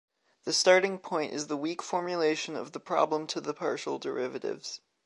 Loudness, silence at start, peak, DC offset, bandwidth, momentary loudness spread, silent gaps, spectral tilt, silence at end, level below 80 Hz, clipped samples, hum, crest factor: -30 LUFS; 0.45 s; -8 dBFS; under 0.1%; 11.5 kHz; 13 LU; none; -3 dB/octave; 0.3 s; -84 dBFS; under 0.1%; none; 22 dB